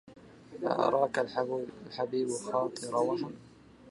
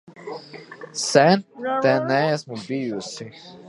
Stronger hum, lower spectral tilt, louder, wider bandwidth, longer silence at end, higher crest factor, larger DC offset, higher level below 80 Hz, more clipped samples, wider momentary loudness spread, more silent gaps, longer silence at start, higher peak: neither; about the same, -5 dB/octave vs -4.5 dB/octave; second, -32 LUFS vs -21 LUFS; about the same, 11.5 kHz vs 11.5 kHz; about the same, 0 s vs 0 s; about the same, 20 dB vs 22 dB; neither; about the same, -70 dBFS vs -70 dBFS; neither; second, 13 LU vs 20 LU; neither; about the same, 0.05 s vs 0.1 s; second, -12 dBFS vs 0 dBFS